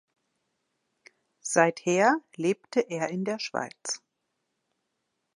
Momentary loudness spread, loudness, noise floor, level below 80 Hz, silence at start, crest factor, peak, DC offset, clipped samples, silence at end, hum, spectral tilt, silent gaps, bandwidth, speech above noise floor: 11 LU; -27 LUFS; -80 dBFS; -82 dBFS; 1.45 s; 24 dB; -6 dBFS; under 0.1%; under 0.1%; 1.4 s; none; -4 dB/octave; none; 11.5 kHz; 54 dB